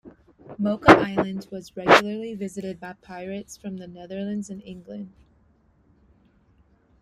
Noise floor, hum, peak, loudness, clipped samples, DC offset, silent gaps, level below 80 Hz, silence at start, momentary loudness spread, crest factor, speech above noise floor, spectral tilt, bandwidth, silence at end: -61 dBFS; none; -2 dBFS; -22 LUFS; under 0.1%; under 0.1%; none; -52 dBFS; 0.05 s; 23 LU; 24 dB; 37 dB; -5.5 dB/octave; 15 kHz; 1.95 s